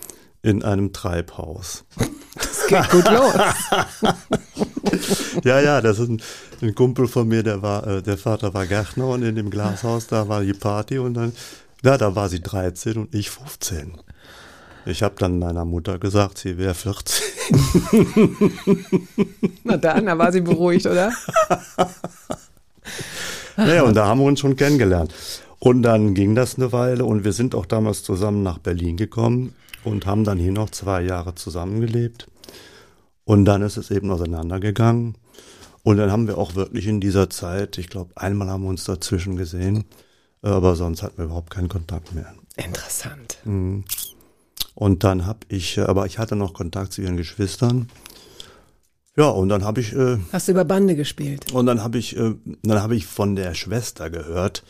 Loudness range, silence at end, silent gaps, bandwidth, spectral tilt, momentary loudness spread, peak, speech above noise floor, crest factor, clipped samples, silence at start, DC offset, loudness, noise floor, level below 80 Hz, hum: 7 LU; 0.1 s; none; 15.5 kHz; -6 dB/octave; 13 LU; -2 dBFS; 41 dB; 18 dB; under 0.1%; 0 s; under 0.1%; -20 LUFS; -61 dBFS; -42 dBFS; none